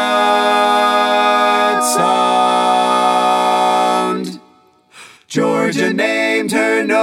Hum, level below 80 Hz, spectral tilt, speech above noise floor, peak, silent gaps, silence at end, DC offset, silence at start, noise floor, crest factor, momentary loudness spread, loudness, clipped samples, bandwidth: none; -70 dBFS; -3 dB/octave; 35 dB; 0 dBFS; none; 0 s; under 0.1%; 0 s; -50 dBFS; 14 dB; 4 LU; -14 LUFS; under 0.1%; 16.5 kHz